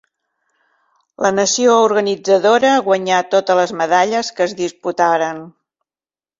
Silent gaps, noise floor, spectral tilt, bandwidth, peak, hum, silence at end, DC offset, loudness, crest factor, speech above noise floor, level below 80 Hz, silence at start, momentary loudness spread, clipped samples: none; under -90 dBFS; -3 dB/octave; 7.8 kHz; -2 dBFS; none; 0.9 s; under 0.1%; -15 LUFS; 16 dB; over 75 dB; -62 dBFS; 1.2 s; 8 LU; under 0.1%